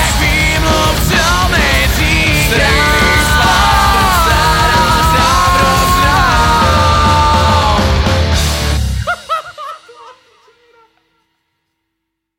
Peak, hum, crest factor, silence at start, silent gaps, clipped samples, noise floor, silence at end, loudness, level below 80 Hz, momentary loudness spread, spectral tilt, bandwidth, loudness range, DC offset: 0 dBFS; none; 10 dB; 0 s; none; under 0.1%; -73 dBFS; 2.25 s; -10 LUFS; -18 dBFS; 6 LU; -4 dB/octave; 17 kHz; 10 LU; under 0.1%